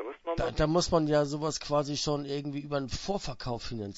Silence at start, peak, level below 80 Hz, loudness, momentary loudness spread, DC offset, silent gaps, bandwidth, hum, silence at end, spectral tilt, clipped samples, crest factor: 0 s; -12 dBFS; -46 dBFS; -31 LUFS; 10 LU; under 0.1%; none; 8 kHz; none; 0 s; -5 dB/octave; under 0.1%; 18 dB